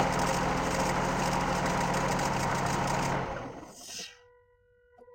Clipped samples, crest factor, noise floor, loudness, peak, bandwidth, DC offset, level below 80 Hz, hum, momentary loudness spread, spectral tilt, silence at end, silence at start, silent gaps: under 0.1%; 18 dB; -65 dBFS; -30 LUFS; -14 dBFS; 17 kHz; under 0.1%; -46 dBFS; none; 12 LU; -4.5 dB/octave; 0.05 s; 0 s; none